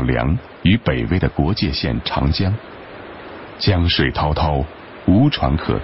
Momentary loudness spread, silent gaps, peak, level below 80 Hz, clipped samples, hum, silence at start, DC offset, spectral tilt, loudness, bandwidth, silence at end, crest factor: 19 LU; none; -2 dBFS; -28 dBFS; under 0.1%; none; 0 s; 0.4%; -10.5 dB/octave; -18 LUFS; 5.8 kHz; 0 s; 16 dB